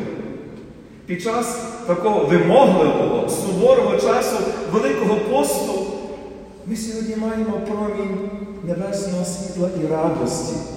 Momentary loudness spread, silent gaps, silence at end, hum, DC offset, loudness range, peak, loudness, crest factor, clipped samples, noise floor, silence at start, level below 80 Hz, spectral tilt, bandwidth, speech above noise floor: 16 LU; none; 0 s; none; under 0.1%; 8 LU; 0 dBFS; -20 LUFS; 20 dB; under 0.1%; -40 dBFS; 0 s; -48 dBFS; -5.5 dB/octave; 16.5 kHz; 21 dB